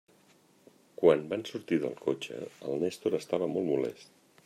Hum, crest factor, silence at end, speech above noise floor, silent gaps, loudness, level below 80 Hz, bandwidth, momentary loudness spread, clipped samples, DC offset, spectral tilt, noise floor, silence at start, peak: none; 22 dB; 0.4 s; 33 dB; none; -31 LUFS; -76 dBFS; 14 kHz; 12 LU; under 0.1%; under 0.1%; -6 dB/octave; -63 dBFS; 1 s; -10 dBFS